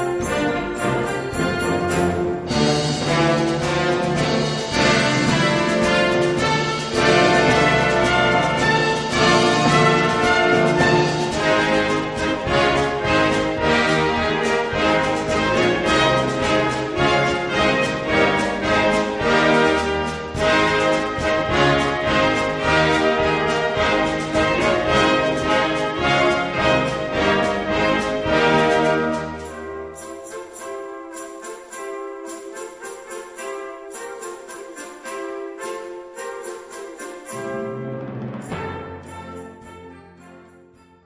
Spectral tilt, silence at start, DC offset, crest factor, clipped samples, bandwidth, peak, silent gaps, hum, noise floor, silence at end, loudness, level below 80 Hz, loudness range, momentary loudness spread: -4.5 dB/octave; 0 s; under 0.1%; 18 dB; under 0.1%; 11 kHz; -2 dBFS; none; none; -50 dBFS; 0.65 s; -18 LUFS; -40 dBFS; 16 LU; 17 LU